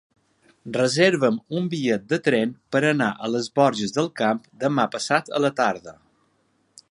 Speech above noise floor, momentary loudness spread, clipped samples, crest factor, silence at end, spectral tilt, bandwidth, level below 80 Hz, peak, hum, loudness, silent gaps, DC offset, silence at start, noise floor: 44 dB; 7 LU; under 0.1%; 20 dB; 1 s; -5 dB/octave; 11.5 kHz; -68 dBFS; -4 dBFS; none; -22 LUFS; none; under 0.1%; 0.65 s; -66 dBFS